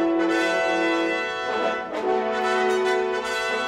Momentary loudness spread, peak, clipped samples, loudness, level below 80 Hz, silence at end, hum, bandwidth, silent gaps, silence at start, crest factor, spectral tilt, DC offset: 4 LU; -12 dBFS; under 0.1%; -23 LUFS; -60 dBFS; 0 s; none; 13.5 kHz; none; 0 s; 12 dB; -3.5 dB/octave; under 0.1%